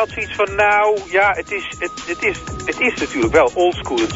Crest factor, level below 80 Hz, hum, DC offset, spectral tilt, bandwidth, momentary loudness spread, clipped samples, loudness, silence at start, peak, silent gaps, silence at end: 16 dB; -40 dBFS; none; under 0.1%; -4 dB/octave; 7.8 kHz; 11 LU; under 0.1%; -17 LUFS; 0 s; -2 dBFS; none; 0 s